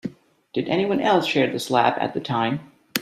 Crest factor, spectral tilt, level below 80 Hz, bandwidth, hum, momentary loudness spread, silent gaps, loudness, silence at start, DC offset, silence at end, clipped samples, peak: 22 dB; -5 dB/octave; -62 dBFS; 15.5 kHz; none; 10 LU; none; -22 LUFS; 0.05 s; under 0.1%; 0 s; under 0.1%; 0 dBFS